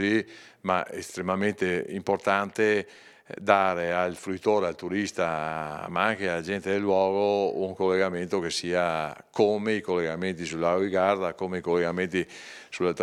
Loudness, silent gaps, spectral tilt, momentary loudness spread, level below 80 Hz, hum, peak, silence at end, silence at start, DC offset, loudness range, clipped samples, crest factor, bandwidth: -27 LUFS; none; -5 dB/octave; 8 LU; -68 dBFS; none; -4 dBFS; 0 s; 0 s; under 0.1%; 2 LU; under 0.1%; 22 dB; 13 kHz